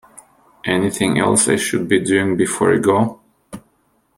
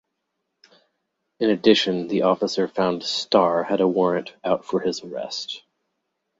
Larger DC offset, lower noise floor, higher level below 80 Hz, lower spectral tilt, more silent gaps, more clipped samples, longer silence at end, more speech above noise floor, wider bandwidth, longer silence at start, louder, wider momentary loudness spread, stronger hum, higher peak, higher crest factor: neither; second, -61 dBFS vs -78 dBFS; first, -54 dBFS vs -64 dBFS; about the same, -4 dB/octave vs -5 dB/octave; neither; neither; second, 0.6 s vs 0.8 s; second, 45 dB vs 56 dB; first, 16 kHz vs 8 kHz; second, 0.15 s vs 1.4 s; first, -16 LUFS vs -22 LUFS; second, 5 LU vs 12 LU; neither; about the same, 0 dBFS vs -2 dBFS; about the same, 18 dB vs 20 dB